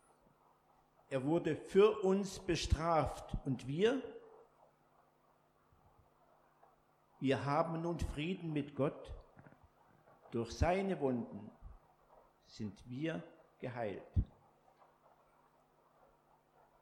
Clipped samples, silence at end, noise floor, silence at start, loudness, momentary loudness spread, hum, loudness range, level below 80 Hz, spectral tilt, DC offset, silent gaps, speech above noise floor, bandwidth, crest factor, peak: under 0.1%; 2.55 s; -72 dBFS; 1.1 s; -37 LUFS; 15 LU; none; 10 LU; -52 dBFS; -6.5 dB/octave; under 0.1%; none; 36 dB; 13 kHz; 22 dB; -18 dBFS